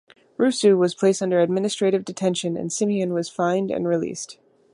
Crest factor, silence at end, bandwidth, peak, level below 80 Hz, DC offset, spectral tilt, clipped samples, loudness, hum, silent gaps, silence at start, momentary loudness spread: 16 dB; 0.4 s; 11.5 kHz; -6 dBFS; -68 dBFS; under 0.1%; -5 dB/octave; under 0.1%; -22 LUFS; none; none; 0.4 s; 8 LU